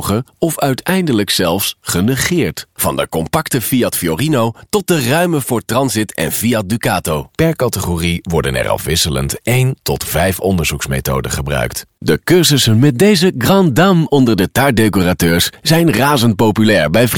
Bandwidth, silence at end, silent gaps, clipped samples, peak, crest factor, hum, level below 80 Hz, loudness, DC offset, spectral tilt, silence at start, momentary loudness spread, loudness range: over 20 kHz; 0 s; none; under 0.1%; 0 dBFS; 14 dB; none; -34 dBFS; -14 LUFS; 0.3%; -4.5 dB/octave; 0 s; 7 LU; 4 LU